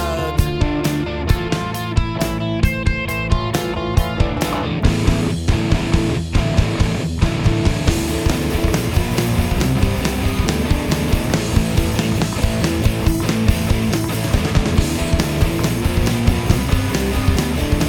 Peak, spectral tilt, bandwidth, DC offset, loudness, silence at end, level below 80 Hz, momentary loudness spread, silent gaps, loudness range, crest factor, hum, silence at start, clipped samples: 0 dBFS; -5.5 dB/octave; 19 kHz; under 0.1%; -19 LUFS; 0 s; -24 dBFS; 3 LU; none; 2 LU; 16 dB; none; 0 s; under 0.1%